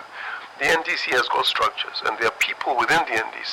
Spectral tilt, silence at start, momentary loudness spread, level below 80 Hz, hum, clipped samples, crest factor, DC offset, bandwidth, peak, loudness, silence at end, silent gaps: -1.5 dB/octave; 0 s; 6 LU; -58 dBFS; none; under 0.1%; 12 dB; under 0.1%; 16.5 kHz; -12 dBFS; -21 LUFS; 0 s; none